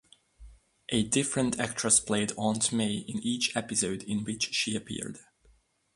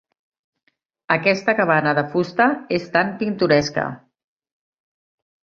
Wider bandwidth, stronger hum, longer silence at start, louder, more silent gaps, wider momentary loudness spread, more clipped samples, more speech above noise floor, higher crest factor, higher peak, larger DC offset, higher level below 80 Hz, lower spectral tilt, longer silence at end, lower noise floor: first, 11.5 kHz vs 7.6 kHz; neither; second, 0.4 s vs 1.1 s; second, -28 LUFS vs -19 LUFS; neither; first, 12 LU vs 7 LU; neither; second, 35 dB vs 50 dB; about the same, 22 dB vs 20 dB; second, -10 dBFS vs -2 dBFS; neither; about the same, -60 dBFS vs -58 dBFS; second, -3 dB/octave vs -6 dB/octave; second, 0.75 s vs 1.6 s; second, -65 dBFS vs -69 dBFS